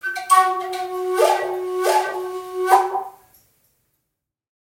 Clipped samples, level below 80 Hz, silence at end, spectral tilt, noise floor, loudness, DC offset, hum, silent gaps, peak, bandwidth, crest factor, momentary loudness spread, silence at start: under 0.1%; -70 dBFS; 1.5 s; -1.5 dB/octave; -79 dBFS; -20 LUFS; under 0.1%; none; none; 0 dBFS; 16.5 kHz; 20 dB; 12 LU; 0.05 s